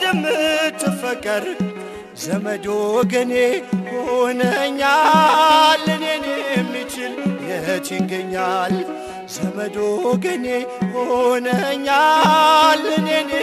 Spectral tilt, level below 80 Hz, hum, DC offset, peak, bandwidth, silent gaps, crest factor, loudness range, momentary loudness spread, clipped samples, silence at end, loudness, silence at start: -4 dB/octave; -56 dBFS; none; under 0.1%; -2 dBFS; 15 kHz; none; 16 dB; 6 LU; 12 LU; under 0.1%; 0 s; -18 LUFS; 0 s